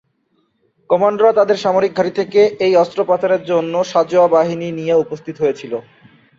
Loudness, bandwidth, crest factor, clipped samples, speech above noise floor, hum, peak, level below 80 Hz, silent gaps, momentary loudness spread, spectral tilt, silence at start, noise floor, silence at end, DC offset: -15 LUFS; 7.6 kHz; 14 dB; under 0.1%; 49 dB; none; -2 dBFS; -62 dBFS; none; 7 LU; -6 dB/octave; 0.9 s; -63 dBFS; 0.6 s; under 0.1%